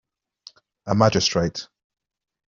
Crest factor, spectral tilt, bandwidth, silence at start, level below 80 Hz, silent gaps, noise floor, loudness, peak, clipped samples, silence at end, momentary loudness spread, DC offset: 22 dB; -4.5 dB/octave; 7.4 kHz; 0.85 s; -54 dBFS; none; -51 dBFS; -21 LUFS; -4 dBFS; under 0.1%; 0.85 s; 17 LU; under 0.1%